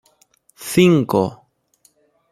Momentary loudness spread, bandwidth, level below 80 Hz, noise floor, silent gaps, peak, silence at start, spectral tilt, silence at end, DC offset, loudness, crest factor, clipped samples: 13 LU; 15 kHz; -58 dBFS; -60 dBFS; none; -2 dBFS; 0.6 s; -6 dB/octave; 0.95 s; under 0.1%; -17 LUFS; 18 dB; under 0.1%